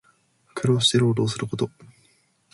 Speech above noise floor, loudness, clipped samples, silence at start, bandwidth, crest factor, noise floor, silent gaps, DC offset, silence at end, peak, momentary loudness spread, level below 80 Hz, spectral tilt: 41 dB; -22 LUFS; under 0.1%; 0.55 s; 11.5 kHz; 18 dB; -63 dBFS; none; under 0.1%; 0.7 s; -6 dBFS; 12 LU; -58 dBFS; -5 dB/octave